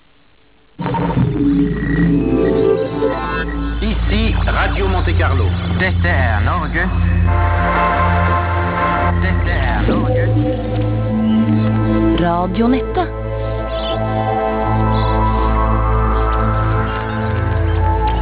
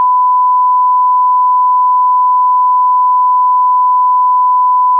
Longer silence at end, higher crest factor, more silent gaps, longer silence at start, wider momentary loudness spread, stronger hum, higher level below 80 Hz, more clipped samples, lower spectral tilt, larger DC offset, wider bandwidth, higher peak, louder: about the same, 0 s vs 0 s; first, 12 dB vs 4 dB; neither; first, 0.8 s vs 0 s; first, 5 LU vs 0 LU; neither; first, -20 dBFS vs under -90 dBFS; neither; first, -11 dB/octave vs -2 dB/octave; first, 0.3% vs under 0.1%; first, 4 kHz vs 1.1 kHz; about the same, -4 dBFS vs -6 dBFS; second, -16 LUFS vs -9 LUFS